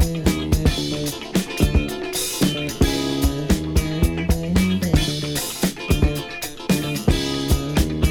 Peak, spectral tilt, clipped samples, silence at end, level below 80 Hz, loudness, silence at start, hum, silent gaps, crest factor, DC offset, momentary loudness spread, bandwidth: -2 dBFS; -5 dB/octave; under 0.1%; 0 s; -26 dBFS; -21 LUFS; 0 s; none; none; 18 dB; under 0.1%; 4 LU; 19.5 kHz